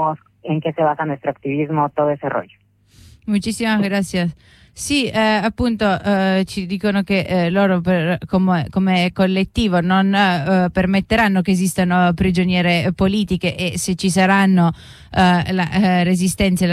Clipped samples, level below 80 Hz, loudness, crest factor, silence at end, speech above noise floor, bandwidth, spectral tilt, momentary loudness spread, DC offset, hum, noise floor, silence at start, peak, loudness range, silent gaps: under 0.1%; -40 dBFS; -17 LUFS; 14 dB; 0 s; 31 dB; 13.5 kHz; -5.5 dB/octave; 7 LU; under 0.1%; none; -48 dBFS; 0 s; -4 dBFS; 5 LU; none